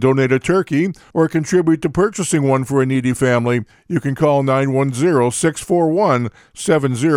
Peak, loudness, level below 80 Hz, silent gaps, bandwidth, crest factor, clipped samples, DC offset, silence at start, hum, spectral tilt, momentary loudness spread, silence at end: -2 dBFS; -17 LUFS; -50 dBFS; none; 15 kHz; 14 dB; under 0.1%; under 0.1%; 0 s; none; -6 dB/octave; 5 LU; 0 s